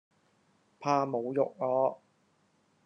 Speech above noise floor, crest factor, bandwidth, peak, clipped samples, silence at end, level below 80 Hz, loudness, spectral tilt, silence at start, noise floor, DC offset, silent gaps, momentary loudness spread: 41 dB; 20 dB; 6.8 kHz; -12 dBFS; under 0.1%; 0.9 s; -84 dBFS; -31 LUFS; -7 dB/octave; 0.8 s; -70 dBFS; under 0.1%; none; 7 LU